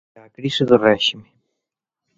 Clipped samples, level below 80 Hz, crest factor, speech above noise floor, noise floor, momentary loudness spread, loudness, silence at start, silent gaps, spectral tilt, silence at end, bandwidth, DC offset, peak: under 0.1%; -58 dBFS; 20 dB; 65 dB; -83 dBFS; 14 LU; -17 LUFS; 0.4 s; none; -5 dB/octave; 0.95 s; 7.8 kHz; under 0.1%; 0 dBFS